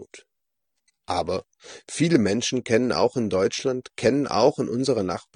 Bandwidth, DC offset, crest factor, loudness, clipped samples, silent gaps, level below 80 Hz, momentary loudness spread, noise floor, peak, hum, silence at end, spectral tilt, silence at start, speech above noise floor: 10 kHz; under 0.1%; 20 dB; -23 LUFS; under 0.1%; none; -60 dBFS; 9 LU; -82 dBFS; -4 dBFS; none; 0.15 s; -5 dB/octave; 0 s; 58 dB